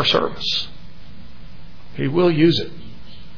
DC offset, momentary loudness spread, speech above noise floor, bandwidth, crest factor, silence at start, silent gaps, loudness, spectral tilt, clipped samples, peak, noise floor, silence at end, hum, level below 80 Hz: 4%; 23 LU; 23 dB; 5.4 kHz; 16 dB; 0 s; none; -19 LUFS; -6 dB/octave; under 0.1%; -4 dBFS; -41 dBFS; 0.1 s; none; -46 dBFS